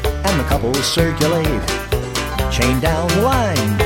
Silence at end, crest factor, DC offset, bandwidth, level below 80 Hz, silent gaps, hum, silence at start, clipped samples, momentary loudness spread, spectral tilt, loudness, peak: 0 s; 16 dB; under 0.1%; 17 kHz; -26 dBFS; none; none; 0 s; under 0.1%; 5 LU; -4.5 dB/octave; -17 LUFS; 0 dBFS